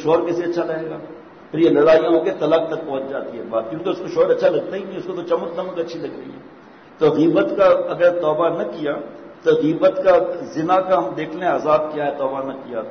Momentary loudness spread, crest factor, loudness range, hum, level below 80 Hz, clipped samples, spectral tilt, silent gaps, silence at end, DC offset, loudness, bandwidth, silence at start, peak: 13 LU; 14 dB; 4 LU; none; -60 dBFS; under 0.1%; -7 dB/octave; none; 0 s; under 0.1%; -19 LUFS; 6.6 kHz; 0 s; -6 dBFS